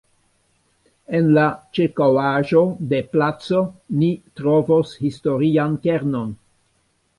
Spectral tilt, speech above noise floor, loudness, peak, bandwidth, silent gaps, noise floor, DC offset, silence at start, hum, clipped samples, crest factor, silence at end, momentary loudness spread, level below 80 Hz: -8.5 dB/octave; 47 dB; -19 LUFS; -4 dBFS; 11.5 kHz; none; -65 dBFS; under 0.1%; 1.1 s; none; under 0.1%; 16 dB; 0.85 s; 8 LU; -56 dBFS